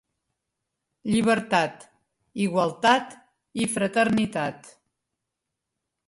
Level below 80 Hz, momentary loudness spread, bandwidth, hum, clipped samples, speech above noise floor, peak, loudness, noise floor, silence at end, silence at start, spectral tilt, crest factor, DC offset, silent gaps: -64 dBFS; 14 LU; 11.5 kHz; none; under 0.1%; 60 dB; -6 dBFS; -24 LUFS; -84 dBFS; 1.4 s; 1.05 s; -4.5 dB/octave; 22 dB; under 0.1%; none